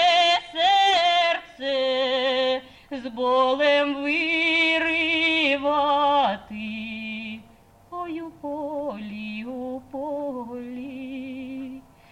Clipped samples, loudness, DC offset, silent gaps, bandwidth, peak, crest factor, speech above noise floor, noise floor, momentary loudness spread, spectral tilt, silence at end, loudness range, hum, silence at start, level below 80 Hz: under 0.1%; -22 LUFS; under 0.1%; none; 10.5 kHz; -10 dBFS; 14 dB; 31 dB; -53 dBFS; 16 LU; -3 dB/octave; 0.3 s; 12 LU; none; 0 s; -60 dBFS